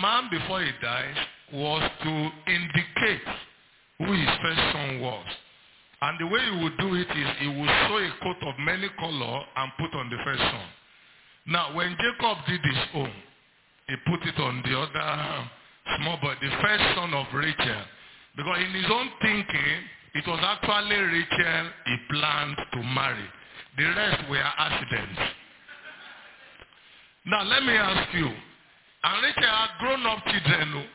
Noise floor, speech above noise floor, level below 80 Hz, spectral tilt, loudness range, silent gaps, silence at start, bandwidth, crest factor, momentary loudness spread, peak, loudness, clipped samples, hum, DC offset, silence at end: -62 dBFS; 35 dB; -52 dBFS; -2 dB/octave; 4 LU; none; 0 s; 4 kHz; 22 dB; 13 LU; -6 dBFS; -26 LUFS; under 0.1%; none; under 0.1%; 0 s